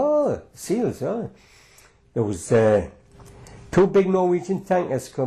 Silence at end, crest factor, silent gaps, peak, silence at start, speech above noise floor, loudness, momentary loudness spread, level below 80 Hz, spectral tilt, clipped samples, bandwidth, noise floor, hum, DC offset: 0 s; 12 dB; none; -10 dBFS; 0 s; 32 dB; -22 LUFS; 13 LU; -50 dBFS; -7 dB/octave; under 0.1%; 13 kHz; -53 dBFS; none; under 0.1%